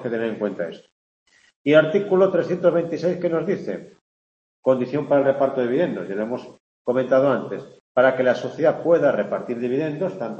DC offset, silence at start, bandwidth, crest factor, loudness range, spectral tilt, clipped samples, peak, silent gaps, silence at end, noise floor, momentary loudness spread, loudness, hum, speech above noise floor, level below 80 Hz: under 0.1%; 0 s; 7.4 kHz; 18 dB; 2 LU; -7.5 dB/octave; under 0.1%; -2 dBFS; 0.92-1.26 s, 1.56-1.65 s, 4.01-4.63 s, 6.60-6.85 s, 7.80-7.95 s; 0 s; under -90 dBFS; 11 LU; -21 LUFS; none; over 69 dB; -70 dBFS